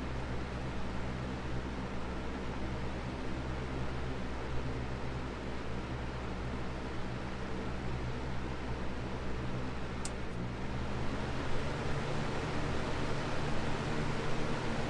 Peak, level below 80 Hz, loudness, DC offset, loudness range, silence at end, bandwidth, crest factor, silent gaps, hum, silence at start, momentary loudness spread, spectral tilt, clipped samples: -22 dBFS; -42 dBFS; -39 LUFS; under 0.1%; 3 LU; 0 s; 10.5 kHz; 14 dB; none; none; 0 s; 4 LU; -6 dB/octave; under 0.1%